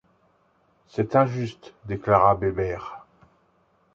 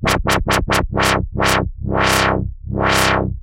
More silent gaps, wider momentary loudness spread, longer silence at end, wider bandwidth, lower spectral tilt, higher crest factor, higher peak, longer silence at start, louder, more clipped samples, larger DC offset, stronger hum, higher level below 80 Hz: neither; first, 20 LU vs 6 LU; first, 0.95 s vs 0 s; second, 7.6 kHz vs 17 kHz; first, -8.5 dB/octave vs -4 dB/octave; first, 22 dB vs 16 dB; second, -4 dBFS vs 0 dBFS; first, 0.95 s vs 0 s; second, -23 LUFS vs -17 LUFS; neither; neither; neither; second, -50 dBFS vs -28 dBFS